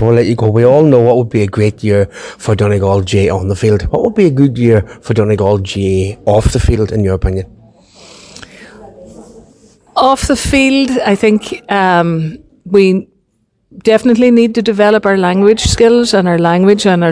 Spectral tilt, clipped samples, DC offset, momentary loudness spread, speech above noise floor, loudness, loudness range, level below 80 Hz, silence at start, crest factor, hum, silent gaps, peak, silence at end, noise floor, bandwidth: -6 dB/octave; 0.6%; under 0.1%; 8 LU; 50 dB; -11 LUFS; 7 LU; -28 dBFS; 0 s; 12 dB; none; none; 0 dBFS; 0 s; -60 dBFS; 10.5 kHz